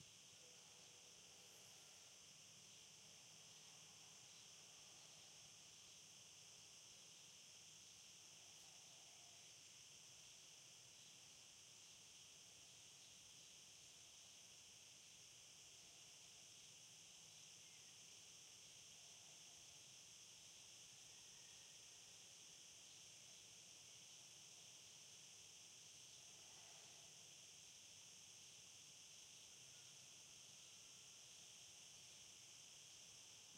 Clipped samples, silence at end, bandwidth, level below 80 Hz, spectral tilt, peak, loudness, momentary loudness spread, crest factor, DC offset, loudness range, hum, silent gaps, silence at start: under 0.1%; 0 s; 16 kHz; under -90 dBFS; 0 dB/octave; -48 dBFS; -61 LUFS; 2 LU; 16 dB; under 0.1%; 1 LU; none; none; 0 s